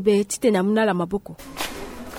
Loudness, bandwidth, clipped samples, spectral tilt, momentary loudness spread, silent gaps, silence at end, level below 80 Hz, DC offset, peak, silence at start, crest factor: -22 LUFS; 17.5 kHz; under 0.1%; -5 dB/octave; 13 LU; none; 0 s; -48 dBFS; under 0.1%; -6 dBFS; 0 s; 16 dB